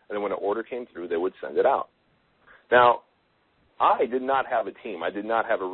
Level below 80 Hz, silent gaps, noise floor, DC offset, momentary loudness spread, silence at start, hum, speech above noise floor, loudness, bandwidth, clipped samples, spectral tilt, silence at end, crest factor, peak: -66 dBFS; none; -67 dBFS; under 0.1%; 13 LU; 0.1 s; none; 43 dB; -25 LUFS; 4.2 kHz; under 0.1%; -8.5 dB/octave; 0 s; 20 dB; -6 dBFS